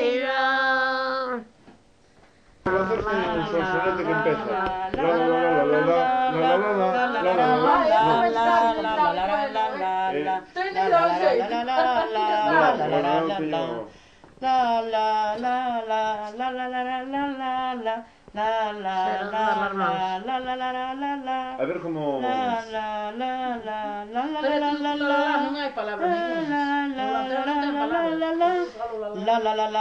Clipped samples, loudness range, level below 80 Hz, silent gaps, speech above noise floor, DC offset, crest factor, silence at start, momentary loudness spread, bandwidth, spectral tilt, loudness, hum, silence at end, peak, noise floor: under 0.1%; 7 LU; -56 dBFS; none; 33 dB; under 0.1%; 16 dB; 0 s; 9 LU; 9 kHz; -5.5 dB/octave; -24 LUFS; none; 0 s; -8 dBFS; -56 dBFS